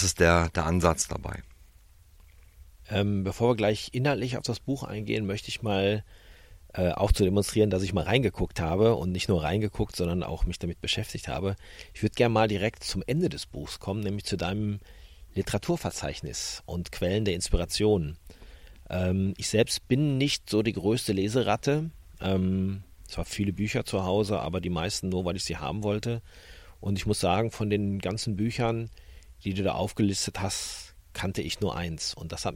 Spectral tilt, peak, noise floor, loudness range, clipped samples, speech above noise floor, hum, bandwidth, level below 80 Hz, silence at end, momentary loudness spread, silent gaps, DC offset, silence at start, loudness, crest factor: -5 dB/octave; -8 dBFS; -55 dBFS; 4 LU; under 0.1%; 28 dB; none; 16.5 kHz; -42 dBFS; 0 s; 10 LU; none; under 0.1%; 0 s; -28 LUFS; 22 dB